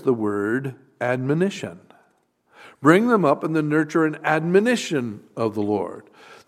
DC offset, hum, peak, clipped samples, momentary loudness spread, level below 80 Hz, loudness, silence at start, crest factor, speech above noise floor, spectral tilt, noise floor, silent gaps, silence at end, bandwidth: under 0.1%; none; 0 dBFS; under 0.1%; 15 LU; -70 dBFS; -21 LUFS; 0 s; 22 dB; 43 dB; -6.5 dB/octave; -64 dBFS; none; 0.15 s; 14 kHz